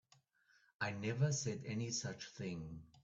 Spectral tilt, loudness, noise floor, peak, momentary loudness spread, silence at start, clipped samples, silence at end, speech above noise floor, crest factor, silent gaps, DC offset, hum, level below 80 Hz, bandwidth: -4.5 dB/octave; -41 LUFS; -74 dBFS; -24 dBFS; 10 LU; 0.8 s; under 0.1%; 0.05 s; 33 dB; 20 dB; none; under 0.1%; none; -72 dBFS; 8.2 kHz